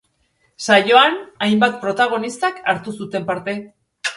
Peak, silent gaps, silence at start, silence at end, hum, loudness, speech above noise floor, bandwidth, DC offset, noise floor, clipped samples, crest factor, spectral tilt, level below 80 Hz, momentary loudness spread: 0 dBFS; none; 0.6 s; 0 s; none; -17 LUFS; 46 dB; 11.5 kHz; under 0.1%; -64 dBFS; under 0.1%; 18 dB; -4 dB/octave; -64 dBFS; 14 LU